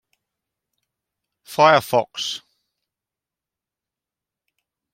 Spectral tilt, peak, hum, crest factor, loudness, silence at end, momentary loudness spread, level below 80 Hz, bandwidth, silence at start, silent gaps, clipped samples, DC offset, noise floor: -3.5 dB/octave; 0 dBFS; none; 24 dB; -18 LUFS; 2.55 s; 16 LU; -70 dBFS; 16.5 kHz; 1.5 s; none; under 0.1%; under 0.1%; -88 dBFS